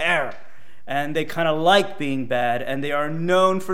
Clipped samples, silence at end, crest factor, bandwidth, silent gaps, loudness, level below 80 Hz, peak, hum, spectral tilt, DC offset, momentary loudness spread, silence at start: under 0.1%; 0 s; 18 dB; 16 kHz; none; -22 LUFS; -66 dBFS; -4 dBFS; none; -5 dB/octave; 3%; 9 LU; 0 s